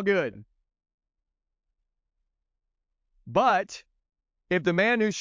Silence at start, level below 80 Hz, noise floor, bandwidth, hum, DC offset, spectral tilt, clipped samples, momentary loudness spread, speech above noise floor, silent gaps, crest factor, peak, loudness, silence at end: 0 s; -66 dBFS; -81 dBFS; 7.6 kHz; none; under 0.1%; -5 dB/octave; under 0.1%; 13 LU; 56 dB; 0.94-0.98 s; 20 dB; -10 dBFS; -25 LUFS; 0 s